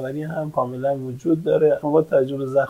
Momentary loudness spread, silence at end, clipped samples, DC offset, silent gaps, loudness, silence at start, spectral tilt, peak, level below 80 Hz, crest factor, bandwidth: 8 LU; 0 s; under 0.1%; under 0.1%; none; -21 LUFS; 0 s; -8.5 dB/octave; -4 dBFS; -62 dBFS; 16 dB; 14.5 kHz